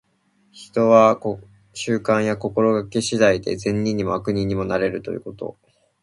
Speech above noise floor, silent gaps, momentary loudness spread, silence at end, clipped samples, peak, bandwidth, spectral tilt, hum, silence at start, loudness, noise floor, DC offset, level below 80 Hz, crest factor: 43 dB; none; 16 LU; 0.5 s; under 0.1%; -2 dBFS; 11.5 kHz; -5.5 dB/octave; none; 0.55 s; -20 LUFS; -63 dBFS; under 0.1%; -50 dBFS; 18 dB